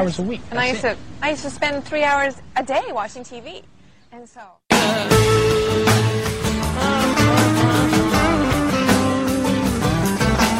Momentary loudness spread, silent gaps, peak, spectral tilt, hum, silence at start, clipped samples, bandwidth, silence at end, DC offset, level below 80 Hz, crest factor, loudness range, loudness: 9 LU; none; -2 dBFS; -5 dB/octave; none; 0 s; under 0.1%; 16 kHz; 0 s; under 0.1%; -34 dBFS; 16 dB; 6 LU; -18 LUFS